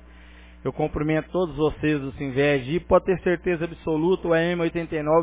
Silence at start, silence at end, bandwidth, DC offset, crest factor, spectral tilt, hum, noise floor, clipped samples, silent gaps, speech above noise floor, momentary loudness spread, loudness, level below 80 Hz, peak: 0.35 s; 0 s; 4 kHz; under 0.1%; 18 dB; -11 dB/octave; none; -46 dBFS; under 0.1%; none; 23 dB; 6 LU; -24 LUFS; -44 dBFS; -4 dBFS